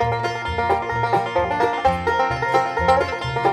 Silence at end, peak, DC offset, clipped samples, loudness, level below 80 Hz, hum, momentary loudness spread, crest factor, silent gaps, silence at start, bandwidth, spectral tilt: 0 s; -4 dBFS; under 0.1%; under 0.1%; -20 LUFS; -40 dBFS; none; 5 LU; 16 dB; none; 0 s; 14.5 kHz; -5.5 dB/octave